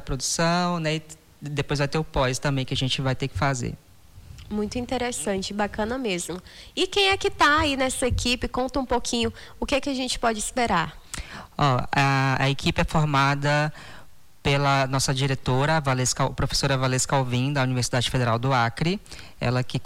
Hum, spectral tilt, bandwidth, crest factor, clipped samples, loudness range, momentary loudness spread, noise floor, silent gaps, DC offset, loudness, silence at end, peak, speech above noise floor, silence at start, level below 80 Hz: none; -4.5 dB/octave; 16 kHz; 16 dB; under 0.1%; 4 LU; 9 LU; -47 dBFS; none; under 0.1%; -24 LUFS; 0 s; -10 dBFS; 23 dB; 0 s; -42 dBFS